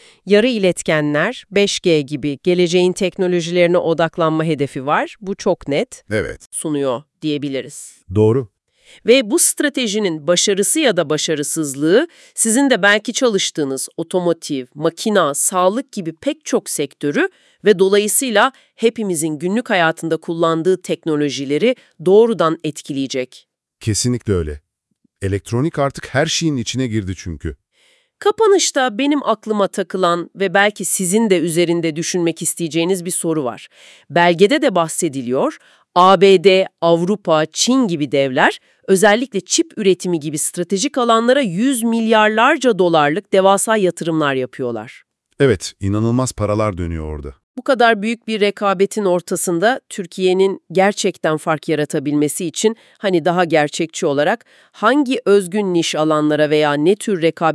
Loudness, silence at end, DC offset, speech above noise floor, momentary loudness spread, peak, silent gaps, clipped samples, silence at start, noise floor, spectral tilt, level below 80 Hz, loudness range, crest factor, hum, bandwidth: -16 LUFS; 0 s; under 0.1%; 49 dB; 10 LU; 0 dBFS; 6.46-6.51 s, 47.43-47.54 s; under 0.1%; 0.25 s; -65 dBFS; -4 dB/octave; -48 dBFS; 6 LU; 16 dB; none; 12 kHz